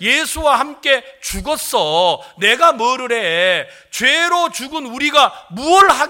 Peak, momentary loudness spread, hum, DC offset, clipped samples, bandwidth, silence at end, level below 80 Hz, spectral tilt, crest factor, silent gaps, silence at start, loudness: 0 dBFS; 11 LU; none; under 0.1%; under 0.1%; 17 kHz; 0 s; -42 dBFS; -1.5 dB/octave; 16 dB; none; 0 s; -15 LUFS